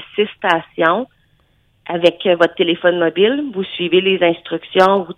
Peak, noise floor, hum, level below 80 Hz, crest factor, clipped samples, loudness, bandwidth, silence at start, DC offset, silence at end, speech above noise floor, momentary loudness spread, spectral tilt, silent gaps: 0 dBFS; -58 dBFS; none; -60 dBFS; 16 dB; under 0.1%; -16 LUFS; 9.2 kHz; 0 s; under 0.1%; 0.05 s; 42 dB; 9 LU; -6 dB/octave; none